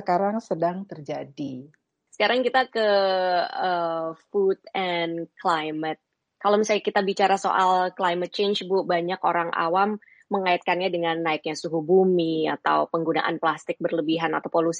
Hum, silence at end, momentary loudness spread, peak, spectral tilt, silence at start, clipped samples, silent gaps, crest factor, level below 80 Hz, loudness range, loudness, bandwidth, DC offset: none; 0 s; 9 LU; -8 dBFS; -5 dB/octave; 0 s; under 0.1%; none; 16 dB; -76 dBFS; 2 LU; -24 LUFS; 10 kHz; under 0.1%